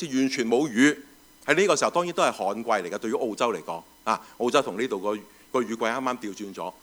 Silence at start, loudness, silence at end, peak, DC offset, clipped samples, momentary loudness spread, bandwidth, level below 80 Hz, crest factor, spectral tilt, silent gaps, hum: 0 s; -26 LUFS; 0.1 s; -4 dBFS; under 0.1%; under 0.1%; 13 LU; over 20 kHz; -70 dBFS; 20 dB; -3.5 dB/octave; none; none